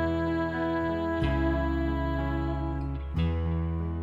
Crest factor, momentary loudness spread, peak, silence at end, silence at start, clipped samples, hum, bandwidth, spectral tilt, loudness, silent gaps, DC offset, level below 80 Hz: 12 dB; 4 LU; -16 dBFS; 0 s; 0 s; under 0.1%; none; 7.4 kHz; -9 dB/octave; -29 LUFS; none; under 0.1%; -34 dBFS